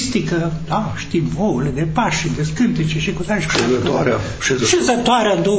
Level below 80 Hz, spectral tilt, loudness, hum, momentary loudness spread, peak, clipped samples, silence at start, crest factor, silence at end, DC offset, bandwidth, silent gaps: -36 dBFS; -4.5 dB/octave; -18 LUFS; none; 6 LU; -2 dBFS; under 0.1%; 0 s; 16 dB; 0 s; under 0.1%; 8 kHz; none